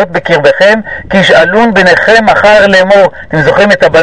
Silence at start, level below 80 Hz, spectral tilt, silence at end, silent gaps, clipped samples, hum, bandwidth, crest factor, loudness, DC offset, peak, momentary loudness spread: 0 s; -34 dBFS; -5 dB/octave; 0 s; none; 7%; none; 11 kHz; 6 dB; -5 LUFS; 2%; 0 dBFS; 5 LU